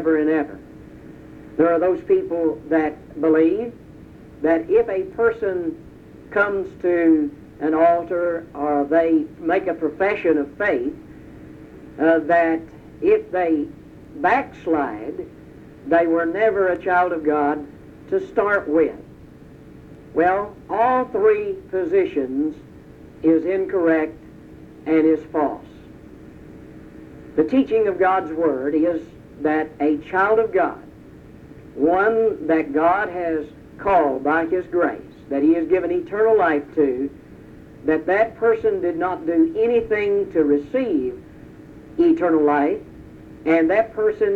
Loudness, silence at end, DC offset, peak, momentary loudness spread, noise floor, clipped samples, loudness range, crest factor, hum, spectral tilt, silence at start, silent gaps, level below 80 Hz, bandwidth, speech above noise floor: -20 LUFS; 0 s; under 0.1%; -6 dBFS; 11 LU; -43 dBFS; under 0.1%; 3 LU; 16 dB; none; -8 dB/octave; 0 s; none; -52 dBFS; 4.7 kHz; 24 dB